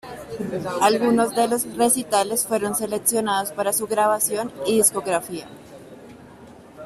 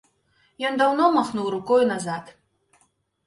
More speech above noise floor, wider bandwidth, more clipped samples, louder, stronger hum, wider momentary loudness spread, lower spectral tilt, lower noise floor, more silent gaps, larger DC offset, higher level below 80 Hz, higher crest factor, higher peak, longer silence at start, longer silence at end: second, 23 dB vs 45 dB; first, 16 kHz vs 11.5 kHz; neither; about the same, -21 LUFS vs -22 LUFS; neither; about the same, 11 LU vs 11 LU; second, -3 dB/octave vs -5 dB/octave; second, -44 dBFS vs -66 dBFS; neither; neither; first, -60 dBFS vs -66 dBFS; about the same, 20 dB vs 18 dB; first, -2 dBFS vs -8 dBFS; second, 0.05 s vs 0.6 s; second, 0 s vs 0.95 s